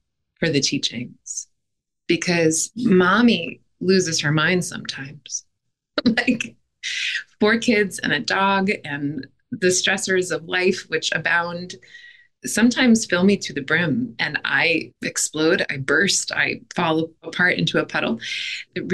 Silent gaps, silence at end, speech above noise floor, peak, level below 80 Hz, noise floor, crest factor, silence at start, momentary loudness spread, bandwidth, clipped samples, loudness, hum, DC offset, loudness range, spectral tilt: none; 0 s; 60 dB; -6 dBFS; -58 dBFS; -80 dBFS; 14 dB; 0.4 s; 13 LU; 12.5 kHz; under 0.1%; -20 LUFS; none; under 0.1%; 3 LU; -3.5 dB/octave